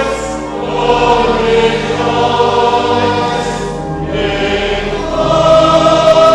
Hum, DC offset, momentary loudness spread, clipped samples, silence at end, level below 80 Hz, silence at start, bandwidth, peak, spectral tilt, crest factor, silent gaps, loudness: none; under 0.1%; 10 LU; under 0.1%; 0 s; -30 dBFS; 0 s; 11.5 kHz; 0 dBFS; -5 dB/octave; 12 dB; none; -12 LUFS